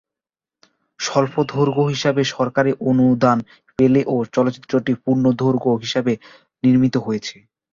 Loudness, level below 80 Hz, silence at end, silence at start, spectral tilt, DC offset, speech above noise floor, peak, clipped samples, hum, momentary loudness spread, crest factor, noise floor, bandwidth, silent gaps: -19 LUFS; -56 dBFS; 0.4 s; 1 s; -6.5 dB/octave; under 0.1%; 71 dB; -2 dBFS; under 0.1%; none; 7 LU; 18 dB; -89 dBFS; 7.4 kHz; none